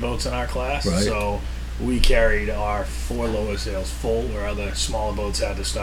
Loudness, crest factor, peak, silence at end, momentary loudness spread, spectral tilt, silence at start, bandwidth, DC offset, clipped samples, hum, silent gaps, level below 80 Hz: -24 LUFS; 22 dB; 0 dBFS; 0 s; 7 LU; -4.5 dB/octave; 0 s; 15.5 kHz; under 0.1%; under 0.1%; none; none; -26 dBFS